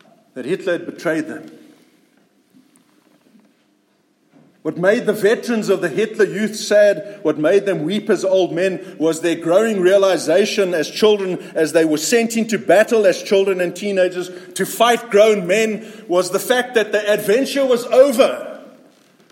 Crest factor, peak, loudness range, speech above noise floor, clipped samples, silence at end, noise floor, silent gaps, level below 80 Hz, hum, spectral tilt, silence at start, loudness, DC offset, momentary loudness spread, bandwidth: 16 dB; 0 dBFS; 9 LU; 44 dB; under 0.1%; 0.65 s; -61 dBFS; none; -70 dBFS; none; -4 dB/octave; 0.35 s; -17 LUFS; under 0.1%; 10 LU; 16.5 kHz